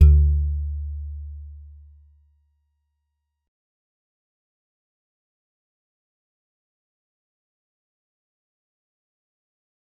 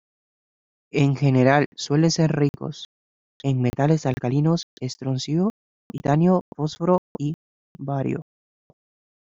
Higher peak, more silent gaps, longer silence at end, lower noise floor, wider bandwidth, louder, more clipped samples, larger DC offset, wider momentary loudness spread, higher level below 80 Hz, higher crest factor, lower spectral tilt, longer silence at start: about the same, -4 dBFS vs -2 dBFS; second, none vs 1.66-1.72 s, 2.49-2.54 s, 2.85-3.40 s, 4.63-4.77 s, 5.50-5.90 s, 6.41-6.52 s, 6.98-7.15 s, 7.34-7.75 s; first, 8.4 s vs 1 s; second, -78 dBFS vs under -90 dBFS; second, 1.4 kHz vs 7.8 kHz; about the same, -23 LUFS vs -22 LUFS; neither; neither; first, 24 LU vs 14 LU; first, -28 dBFS vs -56 dBFS; about the same, 24 dB vs 20 dB; first, -11.5 dB/octave vs -6.5 dB/octave; second, 0 s vs 0.95 s